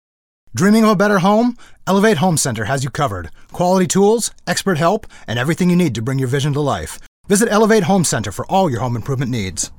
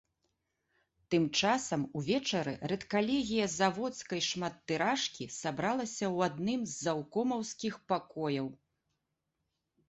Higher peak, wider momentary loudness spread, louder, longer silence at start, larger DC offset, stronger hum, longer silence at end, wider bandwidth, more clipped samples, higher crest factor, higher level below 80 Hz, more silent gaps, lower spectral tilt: first, -2 dBFS vs -16 dBFS; about the same, 9 LU vs 7 LU; first, -16 LUFS vs -33 LUFS; second, 0.5 s vs 1.1 s; neither; neither; second, 0.1 s vs 1.35 s; first, 18 kHz vs 8.4 kHz; neither; second, 14 dB vs 20 dB; first, -42 dBFS vs -68 dBFS; first, 7.08-7.24 s vs none; about the same, -5 dB/octave vs -4 dB/octave